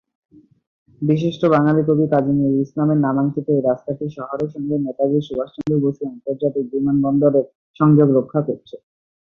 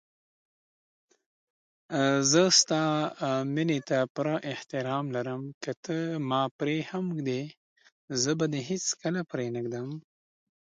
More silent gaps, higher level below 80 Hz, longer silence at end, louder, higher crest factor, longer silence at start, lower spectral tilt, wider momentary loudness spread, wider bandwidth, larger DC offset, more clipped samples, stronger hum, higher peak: second, 7.55-7.74 s vs 4.10-4.15 s, 5.54-5.61 s, 5.77-5.83 s, 6.51-6.59 s, 7.57-7.76 s, 7.92-8.08 s; first, -58 dBFS vs -74 dBFS; about the same, 0.6 s vs 0.6 s; first, -19 LUFS vs -28 LUFS; second, 16 dB vs 22 dB; second, 1 s vs 1.9 s; first, -10 dB/octave vs -4 dB/octave; about the same, 11 LU vs 13 LU; second, 6.4 kHz vs 10.5 kHz; neither; neither; neither; first, -2 dBFS vs -8 dBFS